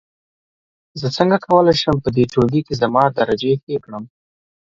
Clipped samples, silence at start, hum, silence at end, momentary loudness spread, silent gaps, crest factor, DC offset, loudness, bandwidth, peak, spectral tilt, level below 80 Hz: under 0.1%; 0.95 s; none; 0.65 s; 12 LU; 3.63-3.67 s; 18 dB; under 0.1%; -17 LUFS; 7.8 kHz; 0 dBFS; -6.5 dB/octave; -46 dBFS